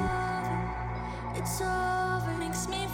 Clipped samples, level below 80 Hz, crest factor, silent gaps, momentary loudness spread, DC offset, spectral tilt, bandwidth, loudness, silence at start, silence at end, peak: under 0.1%; -42 dBFS; 12 dB; none; 6 LU; under 0.1%; -4.5 dB/octave; 17.5 kHz; -32 LUFS; 0 s; 0 s; -20 dBFS